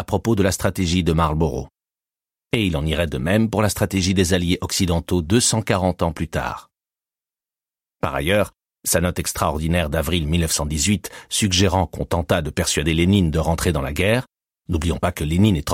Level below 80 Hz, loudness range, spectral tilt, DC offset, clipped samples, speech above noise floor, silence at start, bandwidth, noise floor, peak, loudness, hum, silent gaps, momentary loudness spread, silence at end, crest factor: -34 dBFS; 4 LU; -4.5 dB/octave; under 0.1%; under 0.1%; over 70 dB; 0 s; 16.5 kHz; under -90 dBFS; -4 dBFS; -20 LUFS; none; none; 7 LU; 0 s; 16 dB